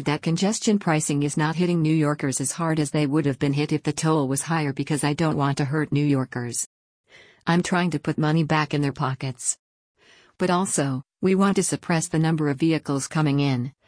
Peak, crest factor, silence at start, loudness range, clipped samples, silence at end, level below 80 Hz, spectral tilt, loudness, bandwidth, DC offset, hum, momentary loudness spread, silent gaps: -8 dBFS; 16 dB; 0 s; 2 LU; under 0.1%; 0.2 s; -58 dBFS; -5.5 dB/octave; -23 LUFS; 10.5 kHz; under 0.1%; none; 6 LU; 6.66-7.04 s, 9.59-9.95 s